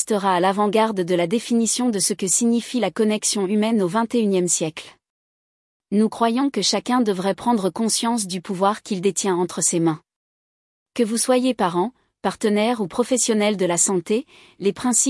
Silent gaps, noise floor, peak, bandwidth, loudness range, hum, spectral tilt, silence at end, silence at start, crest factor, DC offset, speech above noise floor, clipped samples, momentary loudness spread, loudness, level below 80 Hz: 5.10-5.80 s, 10.16-10.86 s; under -90 dBFS; -4 dBFS; 12 kHz; 3 LU; none; -3.5 dB/octave; 0 s; 0 s; 16 dB; under 0.1%; over 70 dB; under 0.1%; 6 LU; -20 LUFS; -66 dBFS